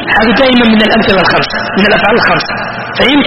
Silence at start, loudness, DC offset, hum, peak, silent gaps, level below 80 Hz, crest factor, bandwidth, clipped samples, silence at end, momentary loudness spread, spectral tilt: 0 s; -8 LUFS; under 0.1%; none; 0 dBFS; none; -32 dBFS; 8 dB; 8.8 kHz; 0.3%; 0 s; 7 LU; -6.5 dB/octave